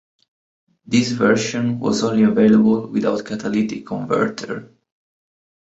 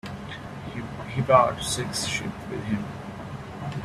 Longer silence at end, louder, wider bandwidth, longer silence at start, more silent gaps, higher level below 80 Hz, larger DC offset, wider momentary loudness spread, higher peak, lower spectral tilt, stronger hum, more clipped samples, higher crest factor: first, 1.1 s vs 0 s; first, -18 LUFS vs -27 LUFS; second, 8 kHz vs 14.5 kHz; first, 0.9 s vs 0.05 s; neither; second, -58 dBFS vs -50 dBFS; neither; second, 11 LU vs 18 LU; about the same, -2 dBFS vs -4 dBFS; about the same, -5.5 dB/octave vs -4.5 dB/octave; neither; neither; second, 16 dB vs 24 dB